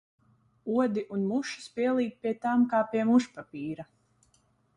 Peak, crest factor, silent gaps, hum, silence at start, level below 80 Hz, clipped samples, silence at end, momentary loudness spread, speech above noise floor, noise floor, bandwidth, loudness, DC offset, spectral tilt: -12 dBFS; 18 dB; none; none; 0.65 s; -70 dBFS; under 0.1%; 0.95 s; 14 LU; 40 dB; -68 dBFS; 10 kHz; -29 LUFS; under 0.1%; -6 dB/octave